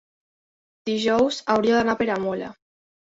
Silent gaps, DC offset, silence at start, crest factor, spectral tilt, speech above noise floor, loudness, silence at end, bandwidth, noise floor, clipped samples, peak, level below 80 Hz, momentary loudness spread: none; under 0.1%; 0.85 s; 18 dB; -5 dB/octave; over 68 dB; -22 LUFS; 0.65 s; 7.8 kHz; under -90 dBFS; under 0.1%; -6 dBFS; -58 dBFS; 12 LU